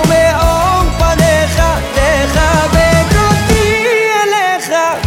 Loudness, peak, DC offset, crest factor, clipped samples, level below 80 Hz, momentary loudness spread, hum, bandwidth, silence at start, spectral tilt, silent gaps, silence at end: -11 LUFS; 0 dBFS; under 0.1%; 10 dB; under 0.1%; -18 dBFS; 3 LU; none; 17.5 kHz; 0 s; -4.5 dB/octave; none; 0 s